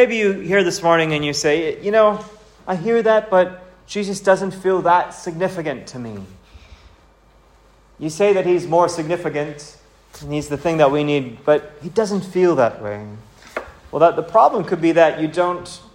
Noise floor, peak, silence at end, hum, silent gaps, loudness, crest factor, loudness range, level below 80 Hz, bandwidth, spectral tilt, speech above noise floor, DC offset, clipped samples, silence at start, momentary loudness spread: -51 dBFS; 0 dBFS; 0.15 s; none; none; -18 LUFS; 18 dB; 5 LU; -52 dBFS; 16 kHz; -5 dB/octave; 34 dB; under 0.1%; under 0.1%; 0 s; 15 LU